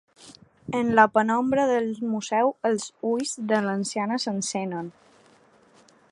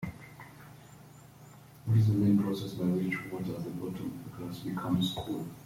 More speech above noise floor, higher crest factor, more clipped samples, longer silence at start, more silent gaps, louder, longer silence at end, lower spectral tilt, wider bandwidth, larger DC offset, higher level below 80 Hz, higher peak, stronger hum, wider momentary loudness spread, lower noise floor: first, 33 dB vs 22 dB; first, 22 dB vs 16 dB; neither; first, 0.2 s vs 0 s; neither; first, -24 LUFS vs -32 LUFS; first, 1.2 s vs 0 s; second, -4.5 dB/octave vs -7 dB/octave; second, 11.5 kHz vs 16.5 kHz; neither; about the same, -66 dBFS vs -62 dBFS; first, -4 dBFS vs -16 dBFS; neither; second, 11 LU vs 24 LU; first, -57 dBFS vs -53 dBFS